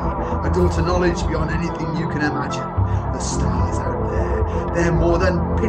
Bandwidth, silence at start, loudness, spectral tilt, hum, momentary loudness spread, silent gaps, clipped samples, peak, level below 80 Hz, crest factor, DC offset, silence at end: 9.6 kHz; 0 s; -21 LUFS; -6.5 dB/octave; none; 5 LU; none; under 0.1%; -6 dBFS; -26 dBFS; 14 dB; under 0.1%; 0 s